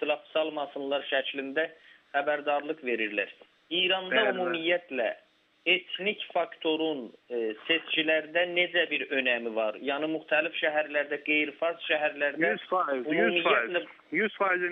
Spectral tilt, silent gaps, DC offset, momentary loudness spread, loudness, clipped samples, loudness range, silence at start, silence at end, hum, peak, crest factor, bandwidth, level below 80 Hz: -6.5 dB/octave; none; under 0.1%; 7 LU; -28 LUFS; under 0.1%; 3 LU; 0 s; 0 s; none; -12 dBFS; 18 dB; 4.7 kHz; -86 dBFS